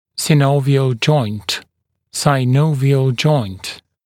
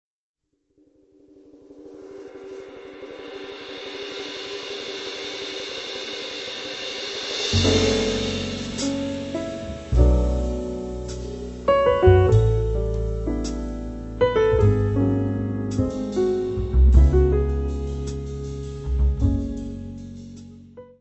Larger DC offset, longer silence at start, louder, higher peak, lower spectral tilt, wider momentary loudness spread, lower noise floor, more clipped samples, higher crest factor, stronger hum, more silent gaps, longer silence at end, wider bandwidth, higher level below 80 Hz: neither; second, 0.15 s vs 1.7 s; first, -16 LUFS vs -23 LUFS; about the same, 0 dBFS vs -2 dBFS; about the same, -6 dB/octave vs -6 dB/octave; second, 11 LU vs 20 LU; about the same, -64 dBFS vs -64 dBFS; neither; second, 16 dB vs 22 dB; neither; neither; first, 0.3 s vs 0.15 s; first, 15.5 kHz vs 8.4 kHz; second, -54 dBFS vs -26 dBFS